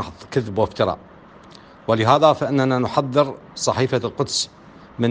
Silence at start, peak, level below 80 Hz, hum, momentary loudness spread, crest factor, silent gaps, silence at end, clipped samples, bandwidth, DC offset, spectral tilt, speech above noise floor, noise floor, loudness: 0 s; 0 dBFS; -54 dBFS; none; 10 LU; 20 dB; none; 0 s; under 0.1%; 10 kHz; under 0.1%; -5 dB/octave; 25 dB; -44 dBFS; -20 LUFS